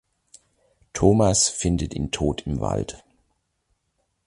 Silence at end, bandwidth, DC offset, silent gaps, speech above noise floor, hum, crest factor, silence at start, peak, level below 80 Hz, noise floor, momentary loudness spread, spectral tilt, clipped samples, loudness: 1.3 s; 11.5 kHz; under 0.1%; none; 51 dB; none; 22 dB; 0.95 s; -2 dBFS; -38 dBFS; -73 dBFS; 11 LU; -4.5 dB/octave; under 0.1%; -22 LUFS